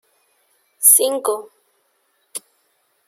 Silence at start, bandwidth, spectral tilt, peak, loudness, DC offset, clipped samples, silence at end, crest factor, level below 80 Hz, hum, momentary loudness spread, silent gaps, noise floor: 0.8 s; 16.5 kHz; 1 dB/octave; 0 dBFS; -14 LUFS; under 0.1%; under 0.1%; 0.7 s; 22 dB; -80 dBFS; none; 22 LU; none; -65 dBFS